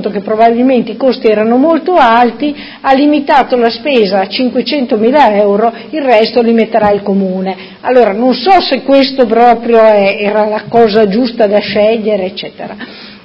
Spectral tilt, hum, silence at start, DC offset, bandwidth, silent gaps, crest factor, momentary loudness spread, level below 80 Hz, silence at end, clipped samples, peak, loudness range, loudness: -7.5 dB/octave; none; 0 s; under 0.1%; 8 kHz; none; 10 dB; 9 LU; -46 dBFS; 0.05 s; 0.8%; 0 dBFS; 2 LU; -9 LUFS